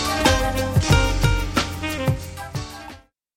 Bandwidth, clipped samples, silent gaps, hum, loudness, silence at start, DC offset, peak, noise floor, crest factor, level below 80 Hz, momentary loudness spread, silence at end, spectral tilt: 17 kHz; under 0.1%; none; none; -21 LUFS; 0 s; under 0.1%; -2 dBFS; -44 dBFS; 18 dB; -28 dBFS; 14 LU; 0.4 s; -4.5 dB/octave